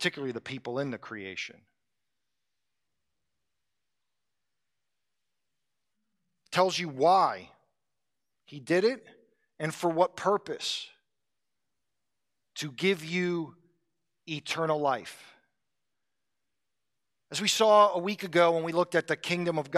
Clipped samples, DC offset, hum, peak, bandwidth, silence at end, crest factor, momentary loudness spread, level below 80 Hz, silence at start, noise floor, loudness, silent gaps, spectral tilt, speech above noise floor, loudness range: under 0.1%; under 0.1%; none; -10 dBFS; 14.5 kHz; 0 s; 22 dB; 16 LU; -82 dBFS; 0 s; -88 dBFS; -28 LUFS; none; -4 dB/octave; 60 dB; 11 LU